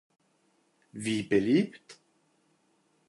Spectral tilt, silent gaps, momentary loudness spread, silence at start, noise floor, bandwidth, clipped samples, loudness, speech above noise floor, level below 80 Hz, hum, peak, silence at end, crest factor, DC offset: -6 dB/octave; none; 12 LU; 0.95 s; -71 dBFS; 11.5 kHz; under 0.1%; -28 LUFS; 43 dB; -68 dBFS; none; -14 dBFS; 1.15 s; 20 dB; under 0.1%